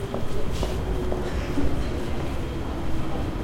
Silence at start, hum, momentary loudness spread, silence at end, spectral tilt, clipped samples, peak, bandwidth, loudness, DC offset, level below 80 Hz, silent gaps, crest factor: 0 s; none; 3 LU; 0 s; -6.5 dB/octave; under 0.1%; -10 dBFS; 15 kHz; -29 LUFS; under 0.1%; -30 dBFS; none; 14 dB